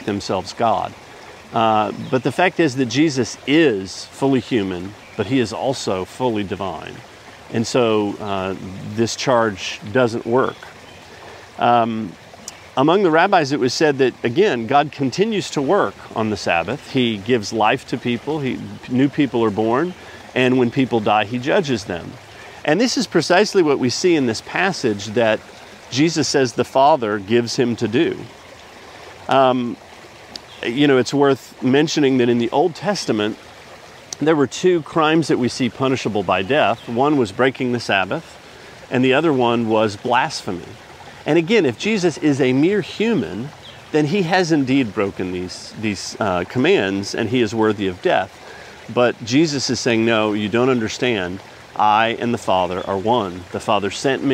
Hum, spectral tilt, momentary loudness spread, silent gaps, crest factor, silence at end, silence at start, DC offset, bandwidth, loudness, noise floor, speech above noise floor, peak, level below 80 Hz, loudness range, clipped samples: none; -5 dB/octave; 14 LU; none; 18 dB; 0 s; 0 s; under 0.1%; 15 kHz; -18 LUFS; -40 dBFS; 22 dB; 0 dBFS; -56 dBFS; 3 LU; under 0.1%